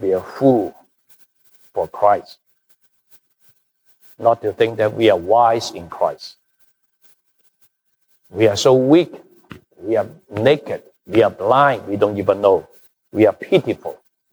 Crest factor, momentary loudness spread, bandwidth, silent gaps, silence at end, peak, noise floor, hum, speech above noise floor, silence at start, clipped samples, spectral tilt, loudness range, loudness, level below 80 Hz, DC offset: 18 dB; 14 LU; over 20 kHz; none; 0.35 s; -2 dBFS; -64 dBFS; none; 47 dB; 0 s; under 0.1%; -6 dB/octave; 6 LU; -17 LUFS; -60 dBFS; under 0.1%